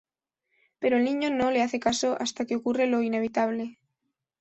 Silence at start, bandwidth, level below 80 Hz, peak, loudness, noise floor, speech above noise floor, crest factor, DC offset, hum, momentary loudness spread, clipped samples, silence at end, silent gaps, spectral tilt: 0.8 s; 8.2 kHz; -64 dBFS; -10 dBFS; -26 LUFS; -81 dBFS; 55 dB; 18 dB; under 0.1%; none; 5 LU; under 0.1%; 0.7 s; none; -3.5 dB/octave